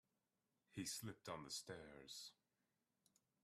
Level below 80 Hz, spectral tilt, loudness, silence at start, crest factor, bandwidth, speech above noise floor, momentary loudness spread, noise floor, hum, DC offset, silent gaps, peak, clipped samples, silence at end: -84 dBFS; -3 dB/octave; -53 LUFS; 0.7 s; 22 dB; 15 kHz; over 36 dB; 8 LU; under -90 dBFS; none; under 0.1%; none; -34 dBFS; under 0.1%; 1.1 s